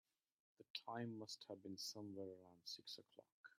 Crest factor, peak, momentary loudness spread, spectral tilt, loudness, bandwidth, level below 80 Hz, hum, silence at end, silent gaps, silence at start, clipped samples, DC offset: 24 dB; -30 dBFS; 8 LU; -3.5 dB/octave; -53 LUFS; 15.5 kHz; under -90 dBFS; none; 0.1 s; 0.70-0.74 s, 3.32-3.44 s; 0.6 s; under 0.1%; under 0.1%